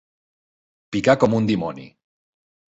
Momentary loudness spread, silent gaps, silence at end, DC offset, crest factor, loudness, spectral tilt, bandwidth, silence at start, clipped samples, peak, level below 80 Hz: 14 LU; none; 0.85 s; under 0.1%; 20 dB; -20 LUFS; -6.5 dB/octave; 8 kHz; 0.9 s; under 0.1%; -4 dBFS; -56 dBFS